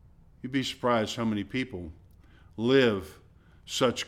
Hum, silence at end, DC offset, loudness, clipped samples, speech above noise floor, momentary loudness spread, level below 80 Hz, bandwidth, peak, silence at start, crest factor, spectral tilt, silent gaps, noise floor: none; 0 s; under 0.1%; -28 LUFS; under 0.1%; 27 dB; 21 LU; -56 dBFS; 15.5 kHz; -10 dBFS; 0.45 s; 20 dB; -5 dB/octave; none; -55 dBFS